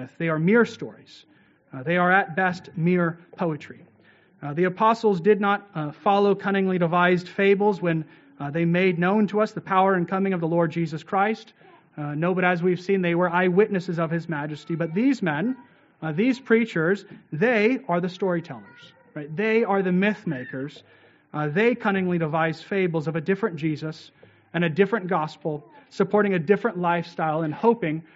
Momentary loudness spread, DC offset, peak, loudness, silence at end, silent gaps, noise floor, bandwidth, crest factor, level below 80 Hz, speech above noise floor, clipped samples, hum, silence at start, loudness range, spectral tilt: 13 LU; under 0.1%; -4 dBFS; -23 LUFS; 0.15 s; none; -57 dBFS; 7.8 kHz; 20 dB; -70 dBFS; 34 dB; under 0.1%; none; 0 s; 4 LU; -5.5 dB/octave